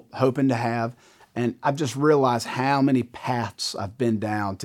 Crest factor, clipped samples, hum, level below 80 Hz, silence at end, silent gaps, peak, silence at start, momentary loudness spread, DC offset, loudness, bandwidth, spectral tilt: 18 dB; under 0.1%; none; -66 dBFS; 0 s; none; -6 dBFS; 0.15 s; 8 LU; under 0.1%; -24 LUFS; 16 kHz; -6 dB/octave